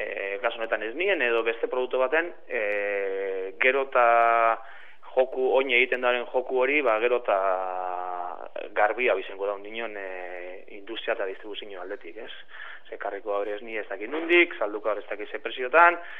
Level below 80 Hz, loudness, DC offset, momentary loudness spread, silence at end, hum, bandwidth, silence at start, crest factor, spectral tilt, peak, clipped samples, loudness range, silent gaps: -82 dBFS; -25 LUFS; 0.9%; 17 LU; 0 s; none; 4.2 kHz; 0 s; 22 dB; -5 dB/octave; -4 dBFS; under 0.1%; 11 LU; none